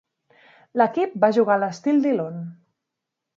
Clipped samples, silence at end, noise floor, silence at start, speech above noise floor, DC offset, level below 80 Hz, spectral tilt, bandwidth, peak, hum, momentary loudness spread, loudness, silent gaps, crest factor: under 0.1%; 0.85 s; -83 dBFS; 0.75 s; 63 dB; under 0.1%; -78 dBFS; -7 dB/octave; 7.6 kHz; -4 dBFS; none; 13 LU; -21 LUFS; none; 20 dB